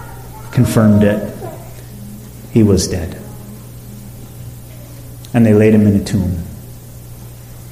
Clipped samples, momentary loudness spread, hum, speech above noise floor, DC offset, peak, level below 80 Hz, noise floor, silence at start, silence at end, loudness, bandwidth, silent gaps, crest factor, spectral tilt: under 0.1%; 23 LU; 60 Hz at -35 dBFS; 21 dB; under 0.1%; -2 dBFS; -36 dBFS; -33 dBFS; 0 s; 0 s; -13 LUFS; 15.5 kHz; none; 14 dB; -7 dB/octave